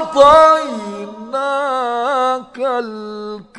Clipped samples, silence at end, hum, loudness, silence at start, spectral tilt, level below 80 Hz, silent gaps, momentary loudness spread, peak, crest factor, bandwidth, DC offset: 0.3%; 0 s; none; -14 LUFS; 0 s; -4 dB/octave; -46 dBFS; none; 19 LU; 0 dBFS; 16 dB; 11 kHz; under 0.1%